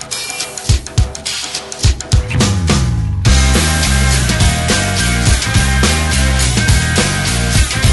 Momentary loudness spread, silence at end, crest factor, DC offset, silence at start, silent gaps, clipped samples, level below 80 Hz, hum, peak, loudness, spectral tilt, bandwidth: 6 LU; 0 s; 12 dB; under 0.1%; 0 s; none; under 0.1%; -18 dBFS; none; 0 dBFS; -13 LUFS; -3.5 dB/octave; 12 kHz